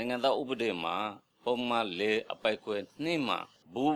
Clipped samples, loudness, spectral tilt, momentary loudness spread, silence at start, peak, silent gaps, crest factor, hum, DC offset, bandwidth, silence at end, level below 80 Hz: under 0.1%; -32 LUFS; -5 dB/octave; 7 LU; 0 s; -14 dBFS; none; 18 dB; none; under 0.1%; 14.5 kHz; 0 s; -76 dBFS